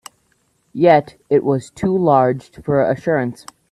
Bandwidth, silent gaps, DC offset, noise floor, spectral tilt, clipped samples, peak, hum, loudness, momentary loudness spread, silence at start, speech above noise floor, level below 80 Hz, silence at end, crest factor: 12.5 kHz; none; under 0.1%; -63 dBFS; -7.5 dB/octave; under 0.1%; 0 dBFS; none; -17 LUFS; 9 LU; 0.75 s; 46 dB; -54 dBFS; 0.4 s; 18 dB